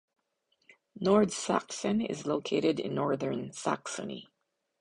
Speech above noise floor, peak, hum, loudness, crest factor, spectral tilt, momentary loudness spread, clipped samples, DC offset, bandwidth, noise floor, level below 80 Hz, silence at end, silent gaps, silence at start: 46 dB; -12 dBFS; none; -31 LUFS; 20 dB; -5 dB/octave; 11 LU; under 0.1%; under 0.1%; 11 kHz; -76 dBFS; -68 dBFS; 0.55 s; none; 0.95 s